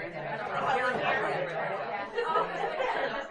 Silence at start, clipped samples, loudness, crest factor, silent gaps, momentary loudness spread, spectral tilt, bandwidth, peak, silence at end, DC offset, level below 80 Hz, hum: 0 s; under 0.1%; -31 LUFS; 16 dB; none; 6 LU; -5 dB/octave; 10.5 kHz; -14 dBFS; 0 s; under 0.1%; -64 dBFS; none